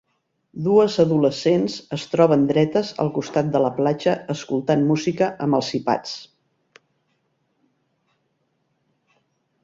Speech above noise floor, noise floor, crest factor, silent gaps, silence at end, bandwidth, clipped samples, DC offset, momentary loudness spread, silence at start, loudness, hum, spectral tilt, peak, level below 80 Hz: 50 dB; -70 dBFS; 18 dB; none; 3.4 s; 7.8 kHz; under 0.1%; under 0.1%; 9 LU; 0.55 s; -20 LUFS; none; -6.5 dB/octave; -4 dBFS; -62 dBFS